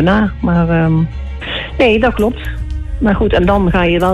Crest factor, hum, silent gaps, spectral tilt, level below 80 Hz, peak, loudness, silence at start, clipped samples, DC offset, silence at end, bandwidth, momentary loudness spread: 10 dB; none; none; -8 dB/octave; -22 dBFS; -2 dBFS; -14 LUFS; 0 s; under 0.1%; under 0.1%; 0 s; 13 kHz; 11 LU